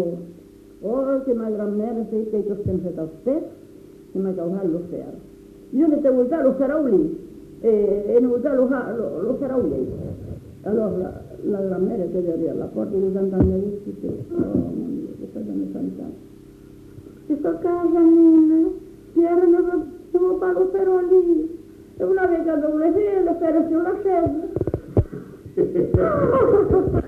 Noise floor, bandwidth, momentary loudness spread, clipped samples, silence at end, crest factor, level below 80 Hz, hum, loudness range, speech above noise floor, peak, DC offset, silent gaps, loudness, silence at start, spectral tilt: -45 dBFS; 3.3 kHz; 15 LU; under 0.1%; 0 s; 16 dB; -42 dBFS; none; 8 LU; 25 dB; -4 dBFS; under 0.1%; none; -21 LUFS; 0 s; -10.5 dB/octave